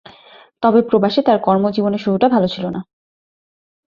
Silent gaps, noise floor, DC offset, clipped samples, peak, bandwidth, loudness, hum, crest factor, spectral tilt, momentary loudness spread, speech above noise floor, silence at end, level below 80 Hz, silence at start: none; -46 dBFS; under 0.1%; under 0.1%; -2 dBFS; 7 kHz; -16 LUFS; none; 16 dB; -8.5 dB/octave; 9 LU; 31 dB; 1.05 s; -58 dBFS; 0.6 s